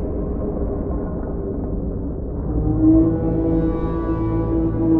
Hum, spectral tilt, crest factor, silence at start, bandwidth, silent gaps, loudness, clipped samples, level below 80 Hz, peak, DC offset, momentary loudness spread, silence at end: none; -13 dB/octave; 16 dB; 0 s; 2.8 kHz; none; -21 LUFS; under 0.1%; -26 dBFS; -4 dBFS; under 0.1%; 11 LU; 0 s